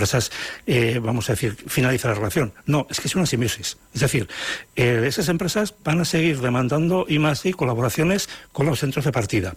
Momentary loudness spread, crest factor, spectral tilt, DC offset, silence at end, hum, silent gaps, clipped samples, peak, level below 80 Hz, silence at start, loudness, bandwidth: 5 LU; 12 dB; -5 dB/octave; under 0.1%; 0 s; none; none; under 0.1%; -10 dBFS; -48 dBFS; 0 s; -22 LUFS; 16 kHz